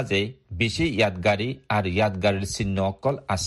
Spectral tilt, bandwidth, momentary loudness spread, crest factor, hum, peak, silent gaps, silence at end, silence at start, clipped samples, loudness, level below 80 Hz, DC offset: -5 dB/octave; 12.5 kHz; 5 LU; 16 dB; none; -8 dBFS; none; 0 s; 0 s; under 0.1%; -24 LUFS; -46 dBFS; under 0.1%